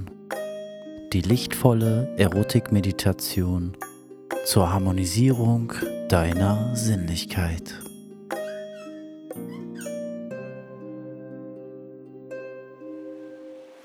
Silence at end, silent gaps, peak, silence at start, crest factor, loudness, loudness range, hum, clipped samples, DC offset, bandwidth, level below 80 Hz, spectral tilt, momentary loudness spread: 0.05 s; none; -2 dBFS; 0 s; 24 dB; -24 LUFS; 14 LU; none; under 0.1%; under 0.1%; 18.5 kHz; -46 dBFS; -6 dB/octave; 20 LU